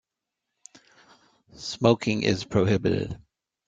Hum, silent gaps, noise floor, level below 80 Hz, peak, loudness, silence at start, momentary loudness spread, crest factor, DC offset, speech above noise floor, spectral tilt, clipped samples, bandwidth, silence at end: none; none; -85 dBFS; -56 dBFS; -4 dBFS; -25 LUFS; 1.55 s; 14 LU; 24 dB; under 0.1%; 61 dB; -6 dB/octave; under 0.1%; 9 kHz; 0.5 s